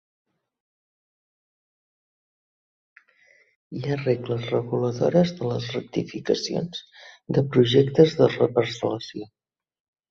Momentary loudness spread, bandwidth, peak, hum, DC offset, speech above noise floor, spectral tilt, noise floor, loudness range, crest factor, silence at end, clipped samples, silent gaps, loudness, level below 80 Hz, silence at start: 15 LU; 7.6 kHz; -2 dBFS; none; under 0.1%; 37 dB; -6.5 dB/octave; -60 dBFS; 10 LU; 22 dB; 0.85 s; under 0.1%; none; -23 LUFS; -60 dBFS; 3.7 s